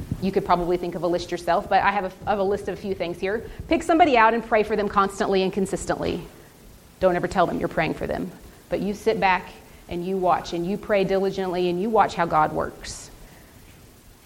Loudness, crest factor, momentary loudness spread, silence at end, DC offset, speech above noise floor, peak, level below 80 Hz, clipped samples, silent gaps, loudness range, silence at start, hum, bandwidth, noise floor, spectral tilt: -23 LUFS; 20 dB; 11 LU; 0.9 s; under 0.1%; 26 dB; -4 dBFS; -46 dBFS; under 0.1%; none; 4 LU; 0 s; none; 17 kHz; -49 dBFS; -5.5 dB/octave